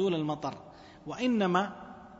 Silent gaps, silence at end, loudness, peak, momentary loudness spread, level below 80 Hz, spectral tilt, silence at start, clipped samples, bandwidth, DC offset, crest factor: none; 0.05 s; -31 LUFS; -12 dBFS; 20 LU; -66 dBFS; -6.5 dB/octave; 0 s; under 0.1%; 8 kHz; under 0.1%; 20 dB